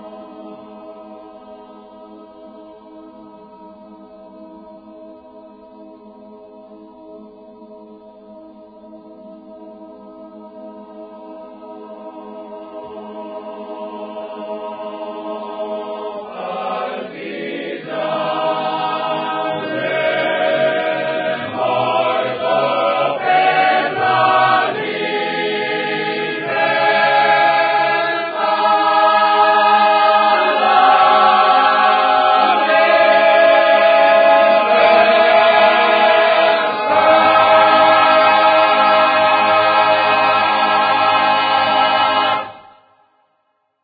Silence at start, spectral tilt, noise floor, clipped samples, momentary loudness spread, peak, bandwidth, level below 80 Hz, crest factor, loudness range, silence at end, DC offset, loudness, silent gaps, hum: 0 s; -8.5 dB/octave; -66 dBFS; under 0.1%; 19 LU; 0 dBFS; 5 kHz; -60 dBFS; 16 dB; 17 LU; 1.25 s; under 0.1%; -13 LUFS; none; none